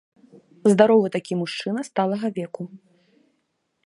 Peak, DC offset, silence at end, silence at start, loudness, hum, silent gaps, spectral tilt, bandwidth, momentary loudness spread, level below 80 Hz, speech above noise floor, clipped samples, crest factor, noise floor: -2 dBFS; under 0.1%; 1.1 s; 0.65 s; -21 LUFS; none; none; -6 dB/octave; 11.5 kHz; 17 LU; -72 dBFS; 52 dB; under 0.1%; 22 dB; -73 dBFS